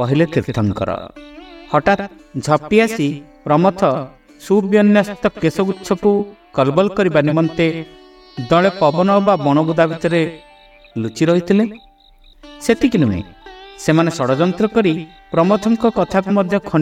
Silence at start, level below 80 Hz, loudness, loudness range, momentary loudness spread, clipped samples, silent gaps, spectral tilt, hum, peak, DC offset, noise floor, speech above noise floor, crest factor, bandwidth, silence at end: 0 s; -46 dBFS; -16 LUFS; 3 LU; 11 LU; under 0.1%; none; -7 dB/octave; none; 0 dBFS; under 0.1%; -47 dBFS; 32 dB; 16 dB; 14.5 kHz; 0 s